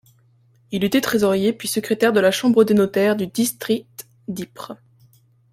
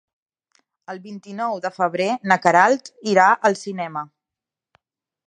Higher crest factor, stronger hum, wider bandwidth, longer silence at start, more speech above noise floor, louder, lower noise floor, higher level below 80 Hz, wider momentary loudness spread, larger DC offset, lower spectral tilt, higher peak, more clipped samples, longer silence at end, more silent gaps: about the same, 18 dB vs 22 dB; neither; first, 16.5 kHz vs 10 kHz; second, 0.7 s vs 0.9 s; second, 38 dB vs 68 dB; about the same, -19 LUFS vs -19 LUFS; second, -57 dBFS vs -88 dBFS; first, -60 dBFS vs -76 dBFS; second, 17 LU vs 20 LU; neither; about the same, -4.5 dB/octave vs -4.5 dB/octave; second, -4 dBFS vs 0 dBFS; neither; second, 0.8 s vs 1.25 s; neither